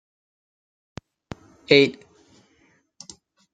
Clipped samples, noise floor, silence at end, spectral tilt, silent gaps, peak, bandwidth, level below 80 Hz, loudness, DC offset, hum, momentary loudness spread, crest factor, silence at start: under 0.1%; -63 dBFS; 1.6 s; -5 dB/octave; none; 0 dBFS; 9 kHz; -60 dBFS; -18 LUFS; under 0.1%; none; 28 LU; 26 dB; 1.7 s